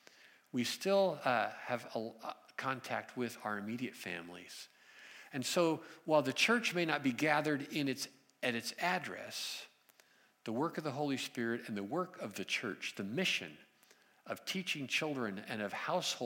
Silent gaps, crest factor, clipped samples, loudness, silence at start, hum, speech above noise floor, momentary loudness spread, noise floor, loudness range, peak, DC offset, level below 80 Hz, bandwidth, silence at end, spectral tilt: none; 22 dB; under 0.1%; -37 LUFS; 0.25 s; none; 31 dB; 13 LU; -68 dBFS; 7 LU; -16 dBFS; under 0.1%; under -90 dBFS; 16.5 kHz; 0 s; -4 dB/octave